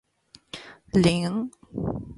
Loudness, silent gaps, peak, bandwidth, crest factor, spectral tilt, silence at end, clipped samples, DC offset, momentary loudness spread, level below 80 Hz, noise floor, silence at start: -25 LUFS; none; -8 dBFS; 11.5 kHz; 18 dB; -6.5 dB/octave; 0 s; under 0.1%; under 0.1%; 20 LU; -48 dBFS; -57 dBFS; 0.55 s